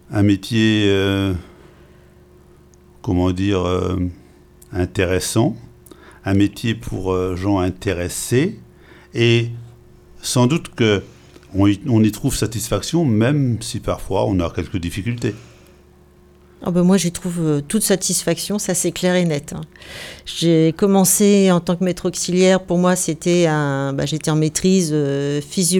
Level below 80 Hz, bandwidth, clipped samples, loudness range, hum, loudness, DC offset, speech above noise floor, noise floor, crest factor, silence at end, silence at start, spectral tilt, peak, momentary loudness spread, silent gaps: -42 dBFS; 18 kHz; under 0.1%; 6 LU; none; -18 LUFS; under 0.1%; 31 dB; -49 dBFS; 16 dB; 0 s; 0.1 s; -5 dB/octave; -2 dBFS; 10 LU; none